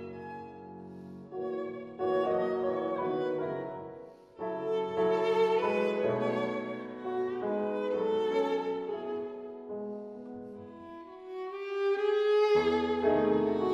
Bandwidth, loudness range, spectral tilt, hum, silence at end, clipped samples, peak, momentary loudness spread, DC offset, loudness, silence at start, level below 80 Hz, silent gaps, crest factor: 7.6 kHz; 5 LU; -6.5 dB/octave; none; 0 s; under 0.1%; -16 dBFS; 19 LU; under 0.1%; -31 LUFS; 0 s; -66 dBFS; none; 16 dB